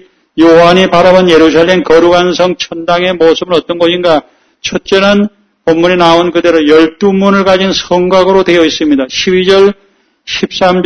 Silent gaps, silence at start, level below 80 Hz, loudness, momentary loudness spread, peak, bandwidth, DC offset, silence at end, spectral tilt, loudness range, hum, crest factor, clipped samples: none; 0.35 s; -38 dBFS; -8 LUFS; 9 LU; 0 dBFS; 11 kHz; 0.4%; 0 s; -5 dB/octave; 3 LU; none; 8 dB; 2%